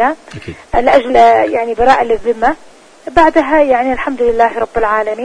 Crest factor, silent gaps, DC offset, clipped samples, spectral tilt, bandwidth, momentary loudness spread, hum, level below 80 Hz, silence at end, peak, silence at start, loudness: 12 dB; none; under 0.1%; 0.3%; -5.5 dB/octave; 10.5 kHz; 12 LU; none; -34 dBFS; 0 s; 0 dBFS; 0 s; -12 LUFS